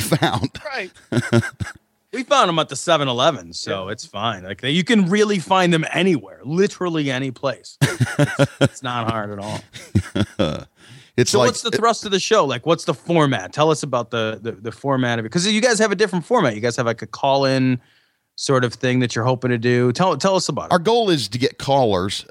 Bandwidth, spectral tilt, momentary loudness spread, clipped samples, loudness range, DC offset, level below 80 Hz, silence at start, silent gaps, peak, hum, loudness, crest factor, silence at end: 16.5 kHz; -5 dB/octave; 10 LU; under 0.1%; 3 LU; under 0.1%; -54 dBFS; 0 s; none; -2 dBFS; none; -19 LUFS; 18 dB; 0.1 s